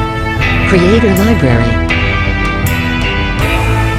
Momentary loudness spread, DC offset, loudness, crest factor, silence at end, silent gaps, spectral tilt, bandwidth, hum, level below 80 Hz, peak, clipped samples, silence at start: 5 LU; 0.6%; -11 LUFS; 10 dB; 0 s; none; -6 dB/octave; 16.5 kHz; none; -20 dBFS; 0 dBFS; under 0.1%; 0 s